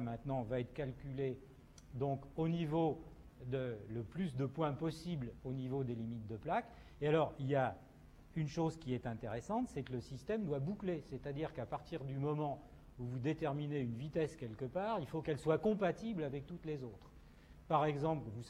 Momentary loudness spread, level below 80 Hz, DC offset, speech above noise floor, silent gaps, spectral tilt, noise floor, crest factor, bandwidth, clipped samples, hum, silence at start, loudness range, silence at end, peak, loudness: 10 LU; -62 dBFS; under 0.1%; 20 dB; none; -8 dB/octave; -60 dBFS; 20 dB; 12 kHz; under 0.1%; none; 0 s; 3 LU; 0 s; -20 dBFS; -40 LUFS